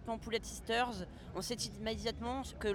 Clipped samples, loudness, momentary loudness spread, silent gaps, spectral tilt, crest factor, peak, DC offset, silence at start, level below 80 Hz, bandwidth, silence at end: under 0.1%; -39 LUFS; 7 LU; none; -3.5 dB/octave; 16 dB; -22 dBFS; under 0.1%; 0 s; -52 dBFS; 19.5 kHz; 0 s